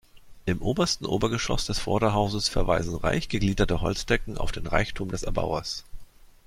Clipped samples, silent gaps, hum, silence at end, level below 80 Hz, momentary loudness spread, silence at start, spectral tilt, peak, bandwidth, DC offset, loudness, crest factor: under 0.1%; none; none; 0.4 s; -34 dBFS; 7 LU; 0.15 s; -5 dB/octave; -6 dBFS; 15 kHz; under 0.1%; -27 LUFS; 20 dB